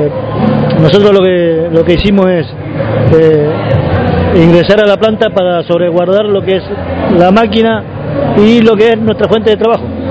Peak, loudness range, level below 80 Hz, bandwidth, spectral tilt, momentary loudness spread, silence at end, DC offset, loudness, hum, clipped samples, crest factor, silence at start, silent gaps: 0 dBFS; 1 LU; -28 dBFS; 8 kHz; -8 dB/octave; 8 LU; 0 s; under 0.1%; -9 LUFS; none; 3%; 8 dB; 0 s; none